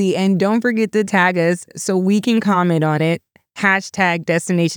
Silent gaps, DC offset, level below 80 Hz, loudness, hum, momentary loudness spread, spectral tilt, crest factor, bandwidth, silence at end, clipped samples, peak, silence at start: none; under 0.1%; -68 dBFS; -17 LUFS; none; 4 LU; -5.5 dB/octave; 16 dB; 19.5 kHz; 0 s; under 0.1%; -2 dBFS; 0 s